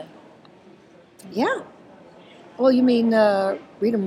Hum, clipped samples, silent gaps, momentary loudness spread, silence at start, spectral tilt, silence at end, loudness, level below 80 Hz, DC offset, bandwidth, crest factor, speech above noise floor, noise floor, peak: none; under 0.1%; none; 12 LU; 0 s; -6.5 dB/octave; 0 s; -21 LUFS; -70 dBFS; under 0.1%; 11.5 kHz; 18 dB; 31 dB; -50 dBFS; -6 dBFS